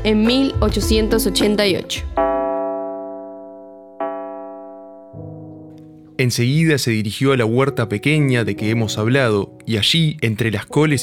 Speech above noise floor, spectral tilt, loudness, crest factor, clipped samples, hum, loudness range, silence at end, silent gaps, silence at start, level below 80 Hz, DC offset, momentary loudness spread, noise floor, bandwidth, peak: 24 dB; -5.5 dB/octave; -18 LUFS; 16 dB; under 0.1%; none; 11 LU; 0 s; none; 0 s; -34 dBFS; under 0.1%; 20 LU; -41 dBFS; 17.5 kHz; -2 dBFS